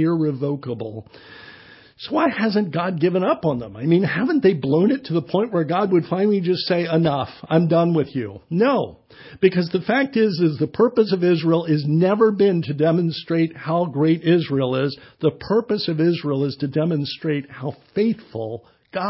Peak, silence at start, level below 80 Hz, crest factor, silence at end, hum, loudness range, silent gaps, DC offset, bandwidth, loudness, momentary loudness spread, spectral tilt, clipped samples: -4 dBFS; 0 s; -58 dBFS; 16 dB; 0 s; none; 4 LU; none; under 0.1%; 5.8 kHz; -20 LUFS; 9 LU; -11.5 dB/octave; under 0.1%